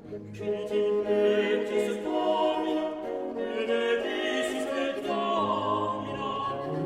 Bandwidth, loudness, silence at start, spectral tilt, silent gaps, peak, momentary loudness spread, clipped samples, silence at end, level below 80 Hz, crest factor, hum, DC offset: 13.5 kHz; -28 LUFS; 0 s; -5 dB/octave; none; -14 dBFS; 7 LU; under 0.1%; 0 s; -64 dBFS; 14 dB; none; under 0.1%